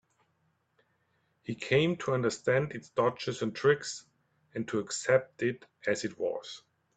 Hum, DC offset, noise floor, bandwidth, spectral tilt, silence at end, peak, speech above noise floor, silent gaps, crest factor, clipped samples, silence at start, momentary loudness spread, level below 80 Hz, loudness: none; under 0.1%; -75 dBFS; 9.2 kHz; -5 dB/octave; 0.35 s; -12 dBFS; 44 dB; none; 20 dB; under 0.1%; 1.5 s; 14 LU; -70 dBFS; -31 LUFS